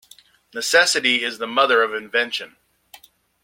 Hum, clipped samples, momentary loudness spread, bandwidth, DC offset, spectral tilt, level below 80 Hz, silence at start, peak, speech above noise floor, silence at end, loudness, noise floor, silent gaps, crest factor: none; under 0.1%; 13 LU; 16.5 kHz; under 0.1%; -0.5 dB/octave; -74 dBFS; 0.55 s; -2 dBFS; 32 dB; 0.95 s; -18 LUFS; -52 dBFS; none; 20 dB